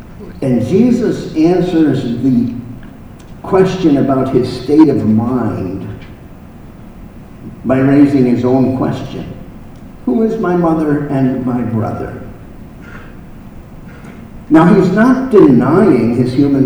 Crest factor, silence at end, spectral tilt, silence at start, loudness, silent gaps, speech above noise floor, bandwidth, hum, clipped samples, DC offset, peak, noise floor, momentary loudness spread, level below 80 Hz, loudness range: 12 dB; 0 s; -8.5 dB/octave; 0 s; -12 LUFS; none; 22 dB; over 20 kHz; none; 0.2%; under 0.1%; 0 dBFS; -33 dBFS; 23 LU; -36 dBFS; 6 LU